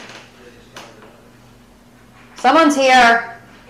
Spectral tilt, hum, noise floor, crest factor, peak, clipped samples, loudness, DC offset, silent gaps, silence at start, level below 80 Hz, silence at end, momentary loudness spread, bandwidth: -2.5 dB/octave; none; -47 dBFS; 12 dB; -6 dBFS; under 0.1%; -12 LUFS; under 0.1%; none; 0 s; -52 dBFS; 0.35 s; 9 LU; 15 kHz